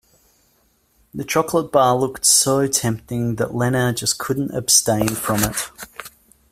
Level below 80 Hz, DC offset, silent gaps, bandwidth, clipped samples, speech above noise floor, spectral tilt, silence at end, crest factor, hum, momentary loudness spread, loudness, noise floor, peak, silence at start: -48 dBFS; under 0.1%; none; 16 kHz; under 0.1%; 42 dB; -3.5 dB/octave; 0.45 s; 20 dB; none; 16 LU; -18 LUFS; -61 dBFS; 0 dBFS; 1.15 s